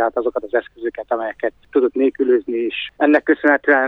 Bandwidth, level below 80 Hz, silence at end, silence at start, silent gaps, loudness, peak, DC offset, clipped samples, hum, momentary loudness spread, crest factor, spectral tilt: 4.9 kHz; -58 dBFS; 0 s; 0 s; none; -19 LUFS; -2 dBFS; under 0.1%; under 0.1%; none; 9 LU; 16 dB; -6 dB/octave